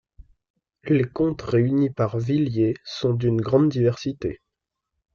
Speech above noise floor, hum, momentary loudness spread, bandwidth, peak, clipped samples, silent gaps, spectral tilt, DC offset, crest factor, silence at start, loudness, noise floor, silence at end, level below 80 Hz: 61 dB; none; 9 LU; 7 kHz; -6 dBFS; under 0.1%; none; -8.5 dB/octave; under 0.1%; 18 dB; 0.85 s; -23 LUFS; -83 dBFS; 0.8 s; -52 dBFS